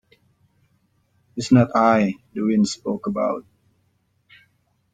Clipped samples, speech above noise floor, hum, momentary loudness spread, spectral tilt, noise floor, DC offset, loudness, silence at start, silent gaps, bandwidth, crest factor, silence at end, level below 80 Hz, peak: under 0.1%; 47 dB; none; 13 LU; -6.5 dB/octave; -66 dBFS; under 0.1%; -20 LUFS; 1.35 s; none; 9.2 kHz; 20 dB; 1.5 s; -60 dBFS; -2 dBFS